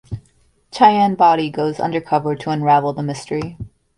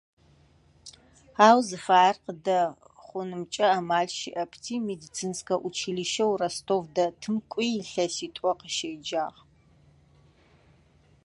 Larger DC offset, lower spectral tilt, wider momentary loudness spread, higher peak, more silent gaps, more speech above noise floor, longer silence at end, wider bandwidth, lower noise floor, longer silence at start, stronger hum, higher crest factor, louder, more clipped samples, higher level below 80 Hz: neither; first, -6.5 dB/octave vs -3.5 dB/octave; first, 19 LU vs 13 LU; first, 0 dBFS vs -4 dBFS; neither; first, 41 dB vs 34 dB; second, 0.3 s vs 1.95 s; about the same, 11.5 kHz vs 11.5 kHz; about the same, -57 dBFS vs -60 dBFS; second, 0.1 s vs 0.85 s; neither; second, 18 dB vs 24 dB; first, -17 LUFS vs -27 LUFS; neither; first, -48 dBFS vs -68 dBFS